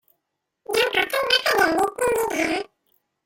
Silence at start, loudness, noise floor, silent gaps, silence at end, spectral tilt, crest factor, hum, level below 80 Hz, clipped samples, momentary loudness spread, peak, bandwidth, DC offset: 0.7 s; -21 LUFS; -79 dBFS; none; 0.6 s; -2 dB/octave; 18 dB; none; -56 dBFS; under 0.1%; 7 LU; -4 dBFS; 16.5 kHz; under 0.1%